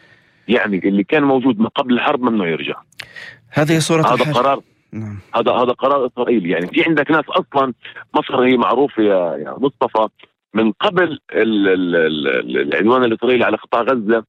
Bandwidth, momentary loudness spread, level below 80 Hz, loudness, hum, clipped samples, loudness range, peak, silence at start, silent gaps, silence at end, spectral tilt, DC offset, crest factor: 14.5 kHz; 9 LU; -60 dBFS; -16 LUFS; none; under 0.1%; 2 LU; -2 dBFS; 0.5 s; none; 0.05 s; -5.5 dB/octave; under 0.1%; 14 dB